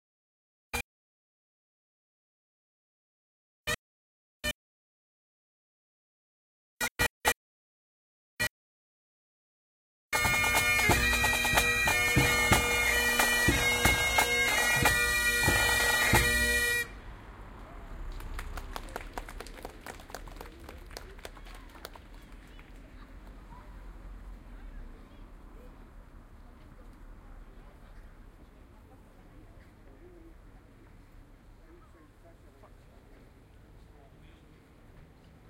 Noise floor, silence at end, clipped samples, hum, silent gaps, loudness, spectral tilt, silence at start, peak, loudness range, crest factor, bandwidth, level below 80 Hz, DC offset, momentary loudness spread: -56 dBFS; 0.45 s; under 0.1%; none; 0.84-3.65 s, 3.78-4.41 s, 4.54-6.77 s, 6.91-6.96 s, 7.10-7.21 s, 7.36-8.37 s, 8.50-10.10 s; -26 LUFS; -2.5 dB/octave; 0.75 s; -8 dBFS; 24 LU; 24 dB; 16 kHz; -44 dBFS; under 0.1%; 25 LU